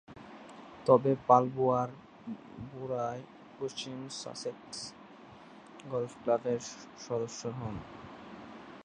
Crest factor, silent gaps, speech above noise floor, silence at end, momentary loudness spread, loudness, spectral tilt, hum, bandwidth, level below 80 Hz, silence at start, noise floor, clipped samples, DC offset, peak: 24 dB; none; 21 dB; 0 s; 24 LU; -32 LUFS; -5.5 dB/octave; none; 10 kHz; -66 dBFS; 0.1 s; -53 dBFS; under 0.1%; under 0.1%; -8 dBFS